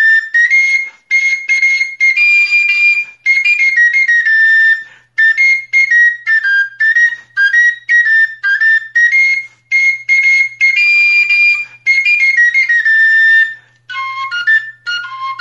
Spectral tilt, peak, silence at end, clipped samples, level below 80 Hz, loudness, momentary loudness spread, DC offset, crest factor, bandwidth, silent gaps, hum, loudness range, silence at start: 3.5 dB/octave; -2 dBFS; 0 s; under 0.1%; -76 dBFS; -8 LUFS; 8 LU; under 0.1%; 8 dB; 9.8 kHz; none; none; 2 LU; 0 s